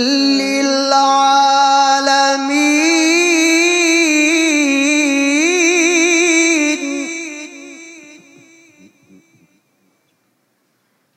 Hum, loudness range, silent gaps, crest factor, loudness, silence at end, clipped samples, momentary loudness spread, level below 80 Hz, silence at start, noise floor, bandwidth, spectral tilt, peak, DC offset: none; 9 LU; none; 14 dB; -12 LUFS; 3.15 s; under 0.1%; 10 LU; -76 dBFS; 0 s; -63 dBFS; 13 kHz; 0 dB/octave; 0 dBFS; under 0.1%